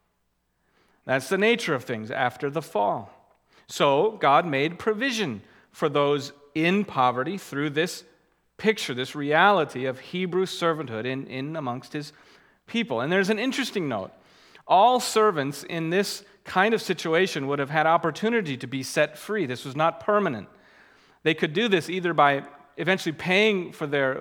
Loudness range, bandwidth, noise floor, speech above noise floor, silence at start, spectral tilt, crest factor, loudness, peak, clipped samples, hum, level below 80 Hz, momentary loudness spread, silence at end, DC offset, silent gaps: 4 LU; 18.5 kHz; -73 dBFS; 48 dB; 1.05 s; -4.5 dB/octave; 22 dB; -25 LUFS; -4 dBFS; under 0.1%; none; -72 dBFS; 11 LU; 0 s; under 0.1%; none